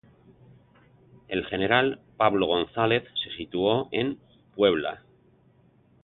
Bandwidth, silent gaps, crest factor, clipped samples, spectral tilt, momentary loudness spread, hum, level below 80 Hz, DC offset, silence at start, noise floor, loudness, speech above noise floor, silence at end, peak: 4.3 kHz; none; 22 dB; under 0.1%; -9.5 dB/octave; 10 LU; none; -58 dBFS; under 0.1%; 1.3 s; -60 dBFS; -26 LUFS; 35 dB; 1.05 s; -6 dBFS